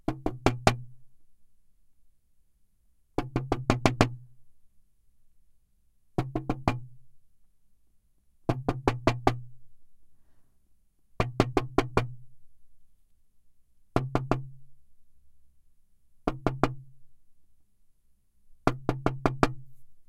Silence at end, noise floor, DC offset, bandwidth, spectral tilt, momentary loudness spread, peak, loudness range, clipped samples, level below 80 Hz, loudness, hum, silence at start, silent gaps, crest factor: 0.05 s; -64 dBFS; under 0.1%; 15.5 kHz; -6.5 dB/octave; 11 LU; 0 dBFS; 5 LU; under 0.1%; -44 dBFS; -30 LUFS; none; 0.1 s; none; 32 dB